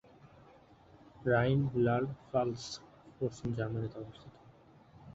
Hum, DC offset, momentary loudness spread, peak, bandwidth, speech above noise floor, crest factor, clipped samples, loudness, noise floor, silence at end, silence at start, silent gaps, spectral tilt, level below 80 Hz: none; under 0.1%; 17 LU; -16 dBFS; 8 kHz; 27 dB; 20 dB; under 0.1%; -34 LUFS; -60 dBFS; 0 s; 0.25 s; none; -7 dB/octave; -62 dBFS